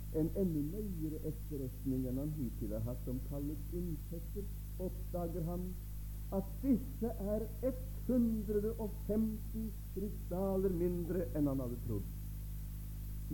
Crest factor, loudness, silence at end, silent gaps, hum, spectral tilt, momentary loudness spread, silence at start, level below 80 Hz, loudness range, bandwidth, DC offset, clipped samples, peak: 16 dB; -40 LUFS; 0 s; none; none; -8.5 dB/octave; 10 LU; 0 s; -44 dBFS; 5 LU; 17.5 kHz; under 0.1%; under 0.1%; -22 dBFS